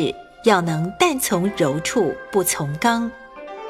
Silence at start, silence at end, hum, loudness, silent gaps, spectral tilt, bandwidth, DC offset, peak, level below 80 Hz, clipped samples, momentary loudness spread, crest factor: 0 s; 0 s; none; -20 LUFS; none; -4.5 dB/octave; 16.5 kHz; under 0.1%; -2 dBFS; -52 dBFS; under 0.1%; 7 LU; 18 dB